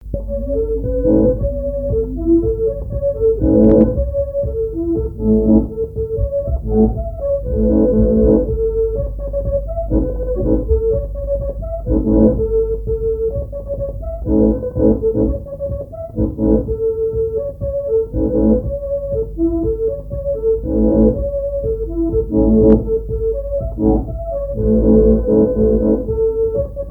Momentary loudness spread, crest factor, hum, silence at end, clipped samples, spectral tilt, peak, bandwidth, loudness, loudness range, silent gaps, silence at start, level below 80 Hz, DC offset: 10 LU; 16 dB; none; 0 s; under 0.1%; -13 dB/octave; 0 dBFS; 1.8 kHz; -17 LUFS; 3 LU; none; 0 s; -24 dBFS; under 0.1%